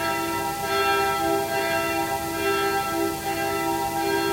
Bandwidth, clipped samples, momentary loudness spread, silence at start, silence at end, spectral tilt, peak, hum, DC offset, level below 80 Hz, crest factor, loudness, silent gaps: 16 kHz; under 0.1%; 4 LU; 0 s; 0 s; -3.5 dB/octave; -10 dBFS; none; under 0.1%; -50 dBFS; 14 dB; -24 LUFS; none